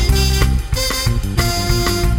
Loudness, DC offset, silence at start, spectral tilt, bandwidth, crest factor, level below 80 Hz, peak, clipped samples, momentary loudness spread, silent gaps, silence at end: -17 LUFS; under 0.1%; 0 s; -4 dB/octave; 17 kHz; 14 dB; -18 dBFS; -2 dBFS; under 0.1%; 3 LU; none; 0 s